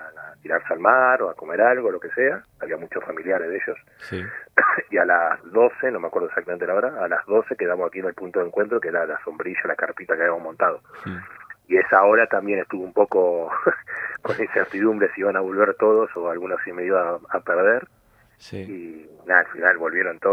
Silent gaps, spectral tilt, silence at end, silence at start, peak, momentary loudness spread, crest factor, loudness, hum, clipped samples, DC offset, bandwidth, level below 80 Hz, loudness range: none; -7.5 dB/octave; 0 s; 0 s; 0 dBFS; 14 LU; 22 dB; -21 LUFS; none; under 0.1%; under 0.1%; 6.4 kHz; -68 dBFS; 4 LU